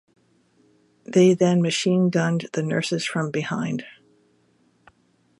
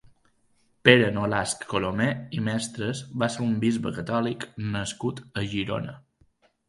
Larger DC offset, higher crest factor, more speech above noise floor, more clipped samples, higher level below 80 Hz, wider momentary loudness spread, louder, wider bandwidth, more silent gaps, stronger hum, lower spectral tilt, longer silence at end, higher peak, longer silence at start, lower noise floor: neither; second, 18 dB vs 26 dB; about the same, 42 dB vs 40 dB; neither; second, -68 dBFS vs -56 dBFS; second, 9 LU vs 12 LU; first, -22 LUFS vs -26 LUFS; about the same, 11.5 kHz vs 11.5 kHz; neither; neither; about the same, -5.5 dB/octave vs -5 dB/octave; first, 1.5 s vs 0.7 s; second, -6 dBFS vs 0 dBFS; first, 1.1 s vs 0.85 s; about the same, -63 dBFS vs -66 dBFS